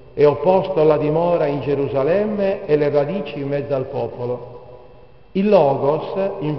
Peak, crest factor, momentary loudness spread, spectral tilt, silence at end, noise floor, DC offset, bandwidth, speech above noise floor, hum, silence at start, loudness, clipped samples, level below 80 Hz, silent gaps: -2 dBFS; 16 dB; 11 LU; -6.5 dB/octave; 0 s; -46 dBFS; 0.5%; 6 kHz; 28 dB; none; 0.15 s; -19 LUFS; under 0.1%; -50 dBFS; none